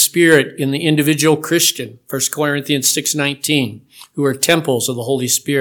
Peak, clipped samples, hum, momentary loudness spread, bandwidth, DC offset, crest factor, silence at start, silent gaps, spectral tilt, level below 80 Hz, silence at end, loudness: 0 dBFS; under 0.1%; none; 7 LU; 19.5 kHz; under 0.1%; 16 dB; 0 s; none; -3.5 dB/octave; -64 dBFS; 0 s; -15 LUFS